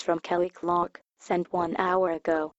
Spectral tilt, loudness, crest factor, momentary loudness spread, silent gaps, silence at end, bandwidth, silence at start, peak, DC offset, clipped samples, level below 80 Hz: -6.5 dB/octave; -28 LUFS; 18 dB; 5 LU; 1.09-1.13 s; 0.1 s; 8 kHz; 0 s; -10 dBFS; under 0.1%; under 0.1%; -64 dBFS